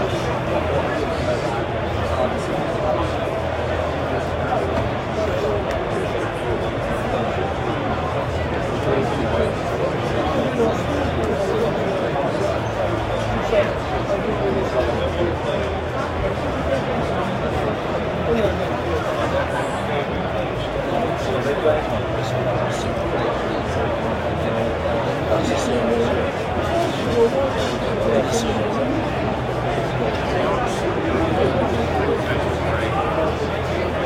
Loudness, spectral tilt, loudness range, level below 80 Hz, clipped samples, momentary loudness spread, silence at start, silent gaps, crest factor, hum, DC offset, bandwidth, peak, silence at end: -21 LUFS; -6 dB/octave; 2 LU; -36 dBFS; under 0.1%; 3 LU; 0 s; none; 16 dB; none; under 0.1%; 16 kHz; -6 dBFS; 0 s